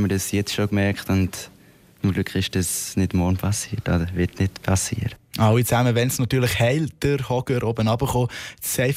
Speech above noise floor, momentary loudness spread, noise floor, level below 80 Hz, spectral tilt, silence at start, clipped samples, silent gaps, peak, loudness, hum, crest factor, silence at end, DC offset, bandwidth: 29 dB; 7 LU; -50 dBFS; -42 dBFS; -5 dB/octave; 0 s; under 0.1%; none; -8 dBFS; -22 LUFS; none; 14 dB; 0 s; under 0.1%; 16 kHz